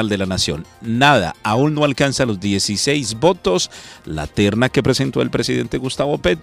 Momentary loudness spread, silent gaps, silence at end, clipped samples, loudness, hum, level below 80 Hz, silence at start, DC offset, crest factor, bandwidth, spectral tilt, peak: 9 LU; none; 0 s; under 0.1%; -18 LUFS; none; -40 dBFS; 0 s; under 0.1%; 18 dB; 15.5 kHz; -4.5 dB/octave; 0 dBFS